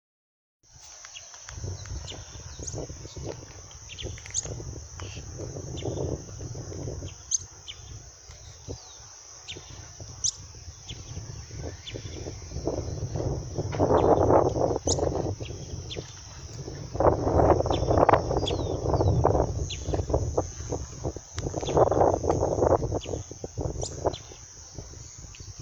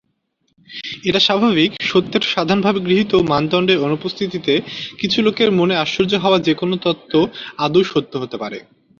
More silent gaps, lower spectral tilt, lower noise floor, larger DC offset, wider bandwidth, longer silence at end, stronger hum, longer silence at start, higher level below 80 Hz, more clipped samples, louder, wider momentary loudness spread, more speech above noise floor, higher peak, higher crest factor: neither; about the same, -5 dB/octave vs -5.5 dB/octave; second, -48 dBFS vs -67 dBFS; neither; first, 18 kHz vs 7.4 kHz; second, 0 s vs 0.4 s; neither; about the same, 0.75 s vs 0.7 s; first, -40 dBFS vs -52 dBFS; neither; second, -28 LUFS vs -17 LUFS; first, 20 LU vs 11 LU; second, 13 dB vs 50 dB; about the same, -4 dBFS vs -2 dBFS; first, 24 dB vs 16 dB